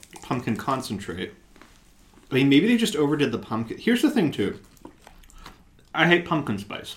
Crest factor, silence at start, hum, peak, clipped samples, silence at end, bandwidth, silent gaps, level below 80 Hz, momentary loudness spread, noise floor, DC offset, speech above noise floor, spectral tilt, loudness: 22 dB; 0.15 s; none; -2 dBFS; under 0.1%; 0 s; 16.5 kHz; none; -54 dBFS; 13 LU; -54 dBFS; under 0.1%; 31 dB; -5.5 dB/octave; -24 LUFS